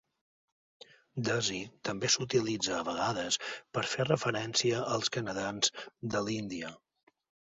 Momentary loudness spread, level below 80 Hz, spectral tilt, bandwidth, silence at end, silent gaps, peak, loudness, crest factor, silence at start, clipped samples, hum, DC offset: 9 LU; -68 dBFS; -3 dB/octave; 7.6 kHz; 0.8 s; none; -12 dBFS; -32 LUFS; 22 dB; 1.15 s; under 0.1%; none; under 0.1%